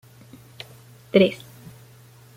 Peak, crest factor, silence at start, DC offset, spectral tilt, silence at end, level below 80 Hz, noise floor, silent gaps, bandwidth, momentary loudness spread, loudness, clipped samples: -4 dBFS; 22 dB; 1.15 s; under 0.1%; -6.5 dB/octave; 1 s; -64 dBFS; -49 dBFS; none; 16 kHz; 25 LU; -20 LUFS; under 0.1%